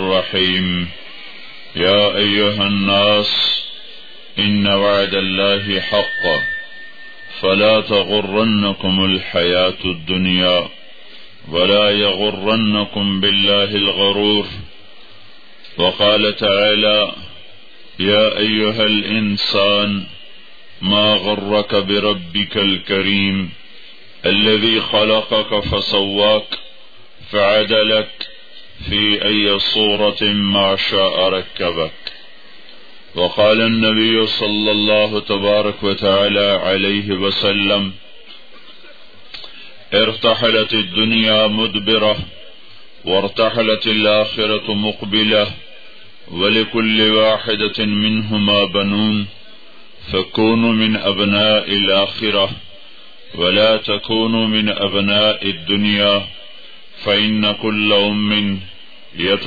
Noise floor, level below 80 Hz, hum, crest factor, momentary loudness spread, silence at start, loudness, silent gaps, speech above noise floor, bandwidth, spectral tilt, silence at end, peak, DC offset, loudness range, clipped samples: -45 dBFS; -48 dBFS; none; 16 dB; 11 LU; 0 s; -15 LUFS; none; 29 dB; 5 kHz; -6.5 dB/octave; 0 s; -2 dBFS; 2%; 2 LU; under 0.1%